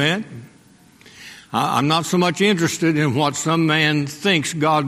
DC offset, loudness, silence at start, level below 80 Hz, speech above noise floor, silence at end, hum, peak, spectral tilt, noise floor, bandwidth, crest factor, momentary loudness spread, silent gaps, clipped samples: under 0.1%; -18 LUFS; 0 s; -60 dBFS; 32 dB; 0 s; none; -2 dBFS; -4.5 dB/octave; -50 dBFS; 15.5 kHz; 18 dB; 9 LU; none; under 0.1%